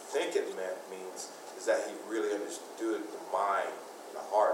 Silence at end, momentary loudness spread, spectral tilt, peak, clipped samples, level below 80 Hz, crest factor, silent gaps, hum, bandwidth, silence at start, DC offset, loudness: 0 s; 12 LU; -2 dB/octave; -16 dBFS; under 0.1%; under -90 dBFS; 18 dB; none; none; 16 kHz; 0 s; under 0.1%; -35 LUFS